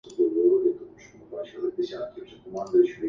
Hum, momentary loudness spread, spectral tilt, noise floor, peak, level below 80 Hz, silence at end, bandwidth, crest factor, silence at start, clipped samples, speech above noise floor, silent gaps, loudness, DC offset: none; 18 LU; -6.5 dB/octave; -47 dBFS; -10 dBFS; -66 dBFS; 0 s; 7.4 kHz; 16 dB; 0.05 s; under 0.1%; 21 dB; none; -25 LUFS; under 0.1%